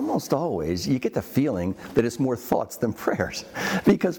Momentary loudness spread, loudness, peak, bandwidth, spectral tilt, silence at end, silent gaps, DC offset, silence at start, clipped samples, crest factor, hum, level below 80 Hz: 5 LU; -25 LUFS; -8 dBFS; 19.5 kHz; -6 dB/octave; 0 s; none; under 0.1%; 0 s; under 0.1%; 16 dB; none; -54 dBFS